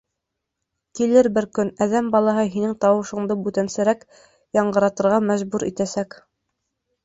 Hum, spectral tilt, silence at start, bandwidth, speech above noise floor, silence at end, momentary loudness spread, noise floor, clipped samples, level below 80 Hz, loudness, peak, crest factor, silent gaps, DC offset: none; -6 dB/octave; 0.95 s; 8 kHz; 61 dB; 1 s; 8 LU; -81 dBFS; under 0.1%; -60 dBFS; -21 LUFS; -4 dBFS; 18 dB; none; under 0.1%